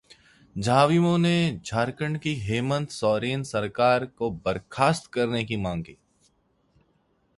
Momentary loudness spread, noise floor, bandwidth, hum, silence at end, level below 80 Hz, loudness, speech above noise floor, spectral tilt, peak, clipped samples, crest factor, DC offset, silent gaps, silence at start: 10 LU; -68 dBFS; 11.5 kHz; none; 1.45 s; -54 dBFS; -25 LUFS; 43 dB; -6 dB/octave; -6 dBFS; under 0.1%; 20 dB; under 0.1%; none; 0.55 s